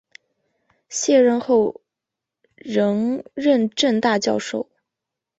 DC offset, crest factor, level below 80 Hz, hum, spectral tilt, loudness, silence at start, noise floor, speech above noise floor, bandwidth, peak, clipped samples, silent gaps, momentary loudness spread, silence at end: under 0.1%; 16 dB; -66 dBFS; none; -4 dB/octave; -20 LUFS; 0.9 s; -85 dBFS; 66 dB; 8.2 kHz; -4 dBFS; under 0.1%; none; 13 LU; 0.75 s